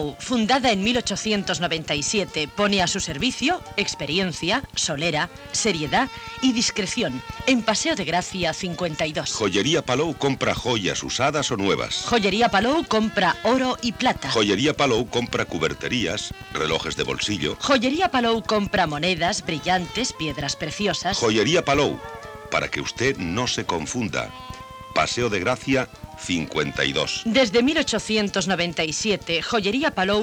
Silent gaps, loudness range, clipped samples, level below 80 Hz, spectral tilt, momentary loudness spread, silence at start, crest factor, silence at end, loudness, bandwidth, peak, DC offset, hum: none; 3 LU; under 0.1%; -46 dBFS; -3.5 dB/octave; 7 LU; 0 s; 18 dB; 0 s; -22 LUFS; 18 kHz; -6 dBFS; under 0.1%; none